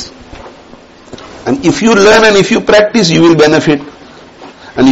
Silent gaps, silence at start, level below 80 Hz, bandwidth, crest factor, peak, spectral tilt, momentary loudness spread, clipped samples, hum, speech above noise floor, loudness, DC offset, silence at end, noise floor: none; 0 s; -40 dBFS; 8.6 kHz; 10 dB; 0 dBFS; -4.5 dB/octave; 17 LU; 0.2%; none; 29 dB; -7 LUFS; under 0.1%; 0 s; -36 dBFS